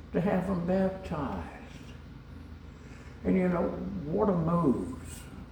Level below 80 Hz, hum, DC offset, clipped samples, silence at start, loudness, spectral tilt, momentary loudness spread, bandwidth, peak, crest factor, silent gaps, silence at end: -50 dBFS; none; under 0.1%; under 0.1%; 0 s; -30 LUFS; -8.5 dB/octave; 20 LU; 18.5 kHz; -12 dBFS; 20 dB; none; 0 s